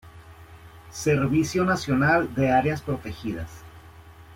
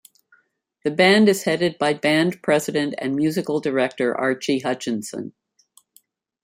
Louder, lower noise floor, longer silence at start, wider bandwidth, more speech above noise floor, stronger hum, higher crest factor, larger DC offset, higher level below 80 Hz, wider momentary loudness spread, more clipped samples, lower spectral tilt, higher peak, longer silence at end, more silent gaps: second, -24 LUFS vs -20 LUFS; second, -47 dBFS vs -66 dBFS; second, 0.05 s vs 0.85 s; about the same, 16.5 kHz vs 16 kHz; second, 24 dB vs 46 dB; neither; about the same, 18 dB vs 18 dB; neither; first, -50 dBFS vs -66 dBFS; first, 15 LU vs 12 LU; neither; about the same, -6 dB/octave vs -5 dB/octave; second, -8 dBFS vs -4 dBFS; second, 0 s vs 1.15 s; neither